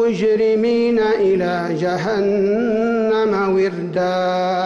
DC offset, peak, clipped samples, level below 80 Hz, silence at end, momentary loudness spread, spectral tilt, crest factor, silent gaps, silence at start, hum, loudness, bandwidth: under 0.1%; -10 dBFS; under 0.1%; -52 dBFS; 0 s; 4 LU; -7 dB/octave; 8 dB; none; 0 s; none; -17 LUFS; 7.8 kHz